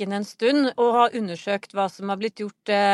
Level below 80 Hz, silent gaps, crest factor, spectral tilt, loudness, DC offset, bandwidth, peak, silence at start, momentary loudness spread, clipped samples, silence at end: -78 dBFS; none; 16 dB; -5 dB/octave; -23 LUFS; under 0.1%; 12 kHz; -6 dBFS; 0 s; 9 LU; under 0.1%; 0 s